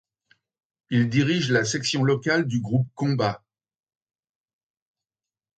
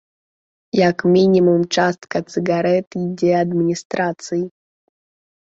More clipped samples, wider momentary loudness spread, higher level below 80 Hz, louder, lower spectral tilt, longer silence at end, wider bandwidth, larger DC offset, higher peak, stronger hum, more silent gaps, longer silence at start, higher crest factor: neither; second, 5 LU vs 11 LU; about the same, -62 dBFS vs -60 dBFS; second, -23 LUFS vs -18 LUFS; about the same, -5.5 dB/octave vs -6 dB/octave; first, 2.2 s vs 1.1 s; first, 9 kHz vs 7.8 kHz; neither; second, -6 dBFS vs -2 dBFS; neither; second, none vs 2.87-2.91 s, 3.85-3.90 s; first, 0.9 s vs 0.75 s; about the same, 20 dB vs 16 dB